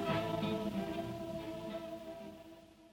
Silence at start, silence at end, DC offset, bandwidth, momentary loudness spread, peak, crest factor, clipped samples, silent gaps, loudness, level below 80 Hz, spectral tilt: 0 s; 0 s; under 0.1%; 19 kHz; 17 LU; -24 dBFS; 16 dB; under 0.1%; none; -40 LUFS; -62 dBFS; -6.5 dB/octave